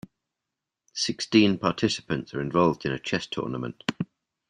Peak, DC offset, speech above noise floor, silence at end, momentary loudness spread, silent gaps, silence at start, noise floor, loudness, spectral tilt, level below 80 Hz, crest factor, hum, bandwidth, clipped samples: -6 dBFS; under 0.1%; 61 dB; 0.45 s; 11 LU; none; 0.95 s; -86 dBFS; -26 LUFS; -5 dB/octave; -60 dBFS; 22 dB; none; 10.5 kHz; under 0.1%